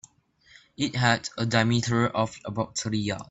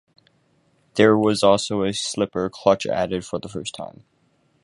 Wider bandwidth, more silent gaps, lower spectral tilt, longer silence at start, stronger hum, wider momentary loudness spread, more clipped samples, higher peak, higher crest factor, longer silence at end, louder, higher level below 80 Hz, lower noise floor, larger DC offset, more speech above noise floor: second, 8.2 kHz vs 11.5 kHz; neither; about the same, -5 dB/octave vs -4.5 dB/octave; second, 0.8 s vs 0.95 s; neither; second, 7 LU vs 14 LU; neither; second, -6 dBFS vs -2 dBFS; about the same, 20 dB vs 20 dB; second, 0.05 s vs 0.75 s; second, -26 LUFS vs -21 LUFS; about the same, -56 dBFS vs -54 dBFS; second, -60 dBFS vs -64 dBFS; neither; second, 34 dB vs 43 dB